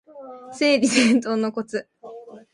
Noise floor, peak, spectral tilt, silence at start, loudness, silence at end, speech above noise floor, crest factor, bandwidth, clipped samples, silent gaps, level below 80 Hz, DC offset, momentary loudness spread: -41 dBFS; -4 dBFS; -3.5 dB/octave; 0.15 s; -20 LUFS; 0.15 s; 21 dB; 18 dB; 11 kHz; under 0.1%; none; -68 dBFS; under 0.1%; 24 LU